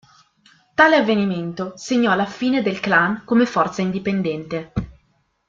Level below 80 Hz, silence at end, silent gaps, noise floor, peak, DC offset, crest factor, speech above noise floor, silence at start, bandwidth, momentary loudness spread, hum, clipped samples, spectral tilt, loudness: -48 dBFS; 0.55 s; none; -64 dBFS; -2 dBFS; under 0.1%; 18 dB; 45 dB; 0.8 s; 7.6 kHz; 13 LU; none; under 0.1%; -5.5 dB/octave; -19 LUFS